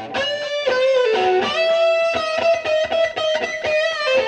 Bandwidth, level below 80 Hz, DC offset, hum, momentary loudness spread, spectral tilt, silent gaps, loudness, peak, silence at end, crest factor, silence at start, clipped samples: 9.4 kHz; -56 dBFS; under 0.1%; none; 5 LU; -2.5 dB/octave; none; -18 LUFS; -8 dBFS; 0 s; 12 dB; 0 s; under 0.1%